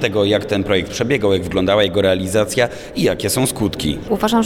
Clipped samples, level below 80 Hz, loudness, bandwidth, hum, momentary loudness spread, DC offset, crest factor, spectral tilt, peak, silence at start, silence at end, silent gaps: under 0.1%; -40 dBFS; -17 LUFS; 18.5 kHz; none; 5 LU; under 0.1%; 14 dB; -4.5 dB/octave; -2 dBFS; 0 s; 0 s; none